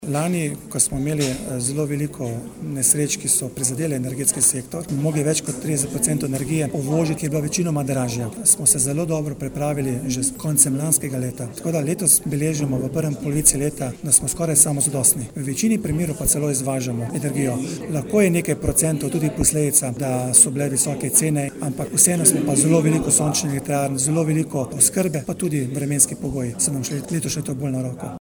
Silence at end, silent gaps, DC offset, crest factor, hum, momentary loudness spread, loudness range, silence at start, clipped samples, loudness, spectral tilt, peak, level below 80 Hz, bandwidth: 0 s; none; under 0.1%; 20 dB; none; 10 LU; 4 LU; 0 s; under 0.1%; -19 LUFS; -4.5 dB/octave; -2 dBFS; -44 dBFS; over 20 kHz